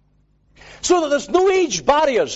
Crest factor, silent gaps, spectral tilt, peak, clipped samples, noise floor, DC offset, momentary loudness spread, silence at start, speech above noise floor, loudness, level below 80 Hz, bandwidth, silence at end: 16 dB; none; -3 dB/octave; -4 dBFS; under 0.1%; -59 dBFS; under 0.1%; 3 LU; 0.65 s; 42 dB; -17 LUFS; -50 dBFS; 8.2 kHz; 0 s